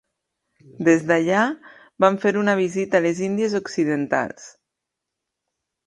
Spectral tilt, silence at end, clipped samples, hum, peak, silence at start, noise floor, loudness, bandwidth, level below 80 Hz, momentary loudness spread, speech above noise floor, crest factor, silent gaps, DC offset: -5.5 dB/octave; 1.35 s; under 0.1%; none; -2 dBFS; 0.8 s; -83 dBFS; -21 LUFS; 10.5 kHz; -68 dBFS; 6 LU; 62 dB; 20 dB; none; under 0.1%